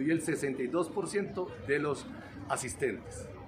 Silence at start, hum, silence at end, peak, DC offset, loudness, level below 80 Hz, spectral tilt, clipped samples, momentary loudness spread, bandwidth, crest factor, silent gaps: 0 s; none; 0 s; -14 dBFS; under 0.1%; -34 LUFS; -60 dBFS; -5 dB/octave; under 0.1%; 11 LU; 15.5 kHz; 20 dB; none